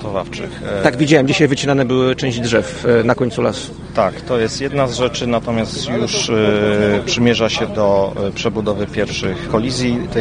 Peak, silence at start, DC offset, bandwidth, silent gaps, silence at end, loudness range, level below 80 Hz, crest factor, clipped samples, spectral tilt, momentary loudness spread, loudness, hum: 0 dBFS; 0 s; under 0.1%; 10 kHz; none; 0 s; 2 LU; -38 dBFS; 16 dB; under 0.1%; -5 dB/octave; 6 LU; -16 LUFS; none